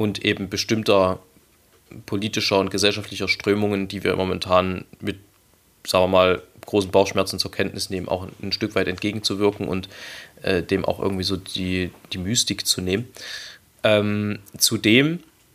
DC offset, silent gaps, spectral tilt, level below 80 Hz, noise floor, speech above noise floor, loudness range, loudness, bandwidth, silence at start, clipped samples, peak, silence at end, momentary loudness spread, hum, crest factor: under 0.1%; none; -4 dB/octave; -54 dBFS; -58 dBFS; 36 dB; 3 LU; -22 LUFS; 15.5 kHz; 0 s; under 0.1%; -2 dBFS; 0.35 s; 13 LU; none; 22 dB